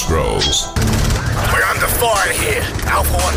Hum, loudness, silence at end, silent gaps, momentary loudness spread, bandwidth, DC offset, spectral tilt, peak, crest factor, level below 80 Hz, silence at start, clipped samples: none; -15 LUFS; 0 s; none; 3 LU; 16.5 kHz; under 0.1%; -3.5 dB/octave; -6 dBFS; 10 dB; -22 dBFS; 0 s; under 0.1%